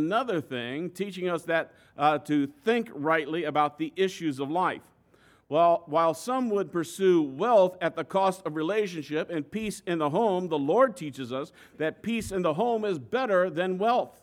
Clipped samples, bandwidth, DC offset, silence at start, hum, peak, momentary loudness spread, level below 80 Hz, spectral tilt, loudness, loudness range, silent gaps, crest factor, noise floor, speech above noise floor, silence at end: under 0.1%; 16.5 kHz; under 0.1%; 0 s; none; -10 dBFS; 10 LU; -64 dBFS; -5.5 dB/octave; -27 LUFS; 3 LU; none; 16 dB; -61 dBFS; 34 dB; 0.15 s